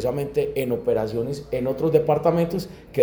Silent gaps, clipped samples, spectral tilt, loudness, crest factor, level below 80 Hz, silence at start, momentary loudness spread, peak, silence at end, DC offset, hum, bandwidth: none; under 0.1%; -7.5 dB/octave; -23 LUFS; 18 dB; -48 dBFS; 0 s; 8 LU; -6 dBFS; 0 s; under 0.1%; none; over 20 kHz